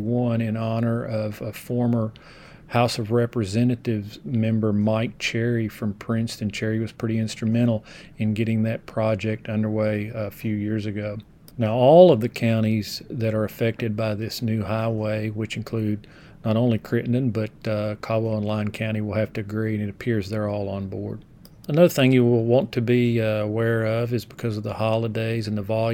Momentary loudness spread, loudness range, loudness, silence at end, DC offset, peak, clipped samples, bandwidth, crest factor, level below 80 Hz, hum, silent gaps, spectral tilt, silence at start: 10 LU; 6 LU; -23 LUFS; 0 s; under 0.1%; -2 dBFS; under 0.1%; 17 kHz; 22 dB; -54 dBFS; none; none; -7 dB/octave; 0 s